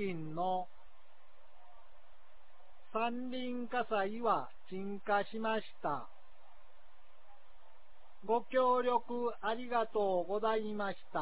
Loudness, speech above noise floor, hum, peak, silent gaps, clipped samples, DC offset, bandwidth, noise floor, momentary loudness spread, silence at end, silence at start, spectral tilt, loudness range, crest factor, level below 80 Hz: -36 LUFS; 31 dB; none; -20 dBFS; none; under 0.1%; 0.8%; 4 kHz; -66 dBFS; 11 LU; 0 s; 0 s; -3.5 dB/octave; 8 LU; 18 dB; -74 dBFS